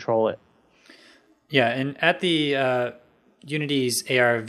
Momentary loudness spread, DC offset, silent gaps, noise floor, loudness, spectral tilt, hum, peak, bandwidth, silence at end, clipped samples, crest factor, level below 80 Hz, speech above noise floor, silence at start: 9 LU; under 0.1%; none; -56 dBFS; -23 LUFS; -4 dB/octave; none; -2 dBFS; 15.5 kHz; 0 s; under 0.1%; 22 dB; -74 dBFS; 33 dB; 0 s